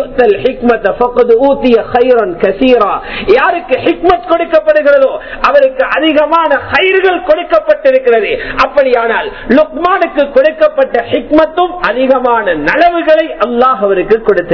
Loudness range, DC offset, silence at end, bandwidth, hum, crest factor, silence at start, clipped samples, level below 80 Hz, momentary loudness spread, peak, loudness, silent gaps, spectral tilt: 1 LU; under 0.1%; 0 s; 5.4 kHz; none; 10 dB; 0 s; 2%; -36 dBFS; 4 LU; 0 dBFS; -9 LUFS; none; -6.5 dB/octave